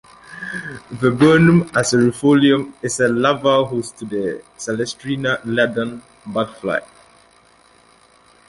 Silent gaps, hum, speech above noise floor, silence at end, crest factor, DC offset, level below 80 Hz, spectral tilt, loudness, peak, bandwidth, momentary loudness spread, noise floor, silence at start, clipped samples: none; none; 35 dB; 1.65 s; 16 dB; under 0.1%; -52 dBFS; -5.5 dB/octave; -18 LUFS; -2 dBFS; 11.5 kHz; 15 LU; -52 dBFS; 0.3 s; under 0.1%